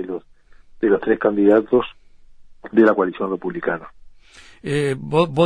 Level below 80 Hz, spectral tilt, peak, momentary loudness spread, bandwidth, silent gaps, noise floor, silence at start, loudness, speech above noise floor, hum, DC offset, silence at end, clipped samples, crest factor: -52 dBFS; -7.5 dB/octave; -2 dBFS; 15 LU; 10.5 kHz; none; -47 dBFS; 0 s; -19 LUFS; 30 dB; none; 0.1%; 0 s; under 0.1%; 18 dB